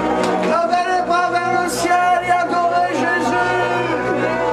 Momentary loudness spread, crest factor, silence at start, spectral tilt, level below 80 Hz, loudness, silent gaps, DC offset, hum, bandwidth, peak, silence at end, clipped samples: 3 LU; 14 dB; 0 s; -4.5 dB/octave; -48 dBFS; -17 LUFS; none; under 0.1%; none; 14 kHz; -4 dBFS; 0 s; under 0.1%